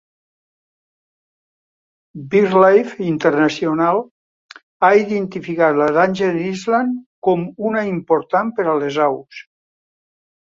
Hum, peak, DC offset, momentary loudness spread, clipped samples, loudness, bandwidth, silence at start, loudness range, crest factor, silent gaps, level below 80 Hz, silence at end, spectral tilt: none; -2 dBFS; under 0.1%; 9 LU; under 0.1%; -17 LUFS; 7.6 kHz; 2.15 s; 3 LU; 18 dB; 4.11-4.49 s, 4.63-4.80 s, 7.06-7.22 s; -62 dBFS; 1 s; -6.5 dB/octave